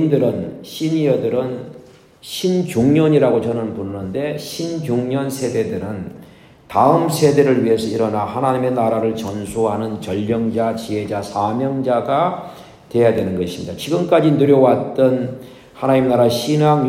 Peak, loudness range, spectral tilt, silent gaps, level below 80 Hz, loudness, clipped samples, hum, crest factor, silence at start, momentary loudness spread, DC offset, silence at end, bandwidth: 0 dBFS; 4 LU; -6.5 dB/octave; none; -54 dBFS; -18 LUFS; under 0.1%; none; 16 dB; 0 s; 12 LU; under 0.1%; 0 s; 16 kHz